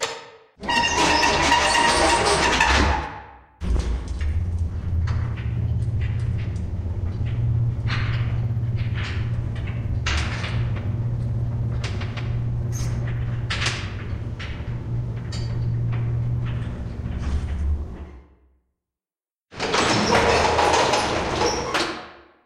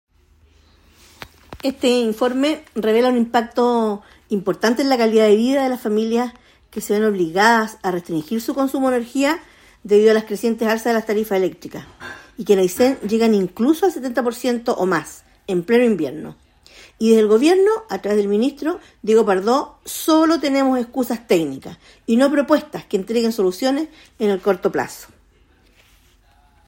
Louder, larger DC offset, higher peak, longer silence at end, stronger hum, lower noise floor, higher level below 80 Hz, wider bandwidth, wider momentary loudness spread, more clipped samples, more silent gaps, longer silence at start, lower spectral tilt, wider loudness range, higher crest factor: second, -23 LUFS vs -18 LUFS; neither; about the same, -4 dBFS vs -2 dBFS; second, 0.25 s vs 1.65 s; neither; first, under -90 dBFS vs -54 dBFS; first, -32 dBFS vs -56 dBFS; second, 12.5 kHz vs 16.5 kHz; about the same, 13 LU vs 13 LU; neither; neither; second, 0 s vs 1.5 s; about the same, -4.5 dB/octave vs -5 dB/octave; first, 8 LU vs 3 LU; about the same, 20 dB vs 18 dB